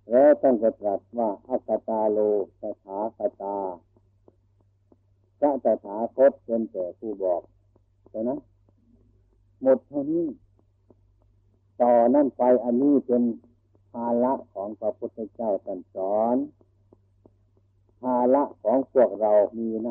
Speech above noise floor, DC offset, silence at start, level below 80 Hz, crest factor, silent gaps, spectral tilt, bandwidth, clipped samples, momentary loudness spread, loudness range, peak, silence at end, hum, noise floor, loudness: 40 dB; under 0.1%; 0.1 s; -68 dBFS; 16 dB; none; -11.5 dB/octave; 3 kHz; under 0.1%; 13 LU; 7 LU; -8 dBFS; 0 s; none; -64 dBFS; -25 LUFS